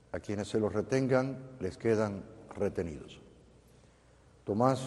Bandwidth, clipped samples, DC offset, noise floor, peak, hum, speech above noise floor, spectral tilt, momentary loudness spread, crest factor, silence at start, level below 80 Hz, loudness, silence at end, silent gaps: 12 kHz; under 0.1%; under 0.1%; -61 dBFS; -12 dBFS; none; 29 dB; -7 dB/octave; 18 LU; 22 dB; 0.15 s; -60 dBFS; -33 LUFS; 0 s; none